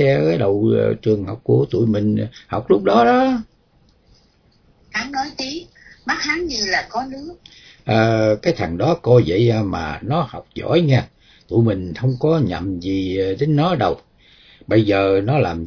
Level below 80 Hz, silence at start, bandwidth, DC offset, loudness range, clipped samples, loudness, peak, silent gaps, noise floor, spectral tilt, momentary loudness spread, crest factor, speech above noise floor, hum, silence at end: -46 dBFS; 0 s; 5.4 kHz; under 0.1%; 5 LU; under 0.1%; -18 LUFS; -2 dBFS; none; -56 dBFS; -6.5 dB/octave; 12 LU; 16 dB; 38 dB; none; 0 s